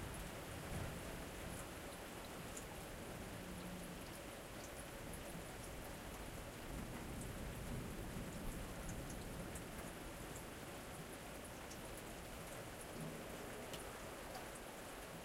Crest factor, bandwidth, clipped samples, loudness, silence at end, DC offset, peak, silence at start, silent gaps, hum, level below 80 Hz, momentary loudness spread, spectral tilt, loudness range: 16 dB; 16 kHz; under 0.1%; -50 LUFS; 0 s; under 0.1%; -34 dBFS; 0 s; none; none; -58 dBFS; 3 LU; -4 dB/octave; 2 LU